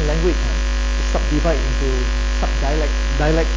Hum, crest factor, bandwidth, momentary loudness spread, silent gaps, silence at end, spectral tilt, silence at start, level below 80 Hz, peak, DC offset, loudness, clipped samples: none; 12 dB; 7.6 kHz; 3 LU; none; 0 s; -5.5 dB/octave; 0 s; -18 dBFS; -4 dBFS; under 0.1%; -20 LUFS; under 0.1%